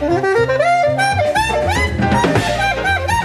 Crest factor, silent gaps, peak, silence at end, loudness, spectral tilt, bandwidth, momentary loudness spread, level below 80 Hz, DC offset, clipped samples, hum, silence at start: 12 dB; none; -2 dBFS; 0 s; -15 LUFS; -5 dB/octave; 14.5 kHz; 2 LU; -30 dBFS; under 0.1%; under 0.1%; none; 0 s